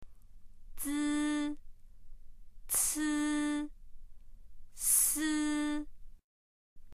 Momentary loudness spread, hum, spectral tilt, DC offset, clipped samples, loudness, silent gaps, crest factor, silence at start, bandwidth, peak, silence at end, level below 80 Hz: 15 LU; none; -1 dB/octave; under 0.1%; under 0.1%; -32 LUFS; 6.24-6.76 s; 22 dB; 0 s; 15.5 kHz; -14 dBFS; 0.05 s; -52 dBFS